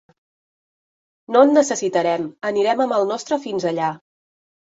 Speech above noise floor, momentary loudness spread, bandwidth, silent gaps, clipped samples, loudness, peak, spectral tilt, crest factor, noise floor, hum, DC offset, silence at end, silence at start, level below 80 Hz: over 72 dB; 10 LU; 8 kHz; none; under 0.1%; -19 LUFS; -2 dBFS; -4.5 dB/octave; 18 dB; under -90 dBFS; none; under 0.1%; 0.8 s; 1.3 s; -68 dBFS